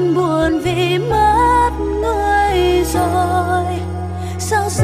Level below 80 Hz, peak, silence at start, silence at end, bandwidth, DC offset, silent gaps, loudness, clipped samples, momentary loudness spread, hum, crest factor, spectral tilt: -28 dBFS; -2 dBFS; 0 s; 0 s; 15.5 kHz; under 0.1%; none; -16 LUFS; under 0.1%; 10 LU; none; 12 dB; -5.5 dB/octave